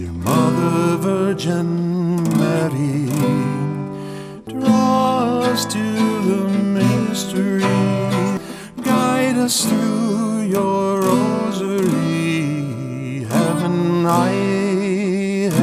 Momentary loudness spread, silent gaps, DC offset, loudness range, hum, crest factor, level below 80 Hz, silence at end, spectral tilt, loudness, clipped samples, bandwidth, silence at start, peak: 7 LU; none; under 0.1%; 1 LU; none; 14 dB; -52 dBFS; 0 s; -6 dB/octave; -18 LUFS; under 0.1%; 16 kHz; 0 s; -2 dBFS